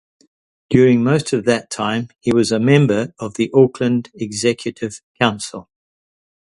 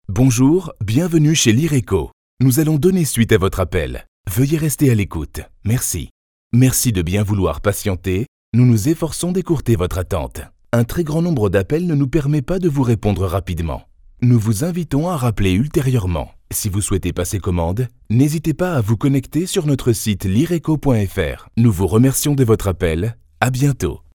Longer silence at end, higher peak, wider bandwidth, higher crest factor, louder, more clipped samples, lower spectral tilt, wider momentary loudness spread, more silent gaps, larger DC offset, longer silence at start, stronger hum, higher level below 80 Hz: first, 0.85 s vs 0.2 s; about the same, 0 dBFS vs 0 dBFS; second, 11.5 kHz vs 19.5 kHz; about the same, 18 dB vs 16 dB; about the same, -17 LUFS vs -17 LUFS; neither; about the same, -6 dB/octave vs -6 dB/octave; first, 13 LU vs 9 LU; second, 5.03-5.15 s vs 2.13-2.37 s, 4.08-4.24 s, 6.11-6.50 s, 8.28-8.52 s; neither; first, 0.7 s vs 0.1 s; neither; second, -54 dBFS vs -34 dBFS